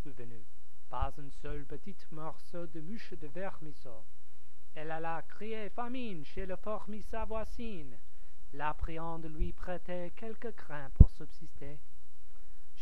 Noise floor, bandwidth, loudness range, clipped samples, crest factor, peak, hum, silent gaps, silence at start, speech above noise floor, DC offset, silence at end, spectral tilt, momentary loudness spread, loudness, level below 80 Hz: -61 dBFS; 6.6 kHz; 11 LU; under 0.1%; 34 dB; -2 dBFS; none; none; 0.05 s; 26 dB; 5%; 0 s; -8 dB/octave; 14 LU; -39 LUFS; -38 dBFS